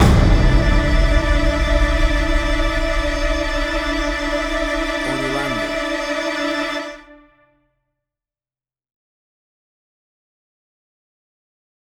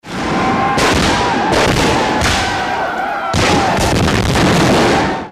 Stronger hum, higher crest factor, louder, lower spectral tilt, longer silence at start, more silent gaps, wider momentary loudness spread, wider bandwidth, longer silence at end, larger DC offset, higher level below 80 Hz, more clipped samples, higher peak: neither; about the same, 18 dB vs 14 dB; second, -19 LUFS vs -13 LUFS; about the same, -5.5 dB/octave vs -4.5 dB/octave; about the same, 0 s vs 0.05 s; neither; about the same, 5 LU vs 6 LU; second, 12.5 kHz vs 16 kHz; first, 4.85 s vs 0 s; neither; first, -22 dBFS vs -28 dBFS; neither; about the same, -2 dBFS vs 0 dBFS